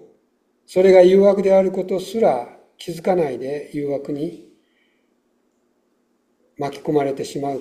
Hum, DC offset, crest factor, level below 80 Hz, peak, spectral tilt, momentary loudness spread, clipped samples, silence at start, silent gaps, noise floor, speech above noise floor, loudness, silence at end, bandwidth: none; under 0.1%; 18 dB; -62 dBFS; 0 dBFS; -7 dB/octave; 17 LU; under 0.1%; 0.7 s; none; -66 dBFS; 48 dB; -18 LUFS; 0 s; 14.5 kHz